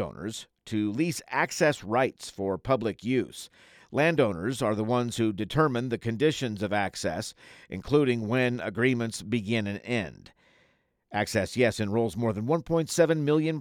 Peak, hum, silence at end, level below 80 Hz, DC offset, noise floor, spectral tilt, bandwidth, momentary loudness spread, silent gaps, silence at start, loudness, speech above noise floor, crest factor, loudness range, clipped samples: -8 dBFS; none; 0 s; -58 dBFS; under 0.1%; -69 dBFS; -5.5 dB/octave; 18 kHz; 10 LU; none; 0 s; -28 LUFS; 41 dB; 20 dB; 2 LU; under 0.1%